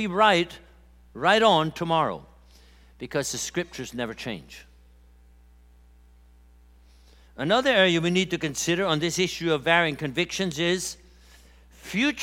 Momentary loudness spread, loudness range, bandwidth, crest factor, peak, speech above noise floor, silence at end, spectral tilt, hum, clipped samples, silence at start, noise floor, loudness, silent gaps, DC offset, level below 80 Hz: 14 LU; 13 LU; 16.5 kHz; 22 dB; -4 dBFS; 29 dB; 0 s; -4 dB/octave; 60 Hz at -55 dBFS; under 0.1%; 0 s; -54 dBFS; -24 LUFS; none; under 0.1%; -54 dBFS